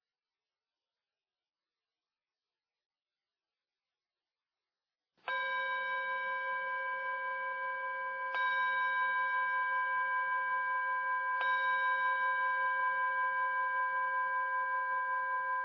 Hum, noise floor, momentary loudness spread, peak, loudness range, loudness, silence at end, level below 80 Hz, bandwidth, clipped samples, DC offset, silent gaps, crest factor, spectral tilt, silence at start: none; under -90 dBFS; 5 LU; -22 dBFS; 7 LU; -33 LUFS; 0 s; under -90 dBFS; 5.4 kHz; under 0.1%; under 0.1%; none; 14 dB; -2 dB/octave; 5.25 s